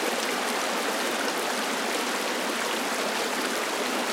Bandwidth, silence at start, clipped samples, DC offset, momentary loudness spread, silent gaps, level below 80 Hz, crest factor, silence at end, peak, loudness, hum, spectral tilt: 17 kHz; 0 s; under 0.1%; under 0.1%; 1 LU; none; -82 dBFS; 16 dB; 0 s; -12 dBFS; -27 LUFS; none; -1 dB/octave